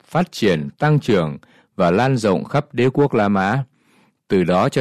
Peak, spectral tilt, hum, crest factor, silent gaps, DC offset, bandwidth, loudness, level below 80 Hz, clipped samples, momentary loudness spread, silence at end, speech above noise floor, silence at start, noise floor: -6 dBFS; -7 dB/octave; none; 14 dB; none; under 0.1%; 13.5 kHz; -18 LUFS; -54 dBFS; under 0.1%; 8 LU; 0 s; 40 dB; 0.1 s; -58 dBFS